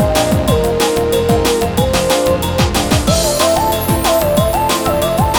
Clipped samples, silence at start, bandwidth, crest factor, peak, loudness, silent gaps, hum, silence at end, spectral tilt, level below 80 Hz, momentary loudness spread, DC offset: under 0.1%; 0 s; 19.5 kHz; 14 dB; 0 dBFS; -13 LUFS; none; none; 0 s; -4.5 dB/octave; -26 dBFS; 2 LU; 0.3%